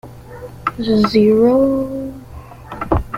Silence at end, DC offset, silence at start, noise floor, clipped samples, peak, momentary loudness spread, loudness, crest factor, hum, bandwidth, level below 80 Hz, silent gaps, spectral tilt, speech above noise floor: 0 s; under 0.1%; 0.05 s; -35 dBFS; under 0.1%; -2 dBFS; 24 LU; -15 LUFS; 16 dB; none; 15.5 kHz; -34 dBFS; none; -7.5 dB/octave; 21 dB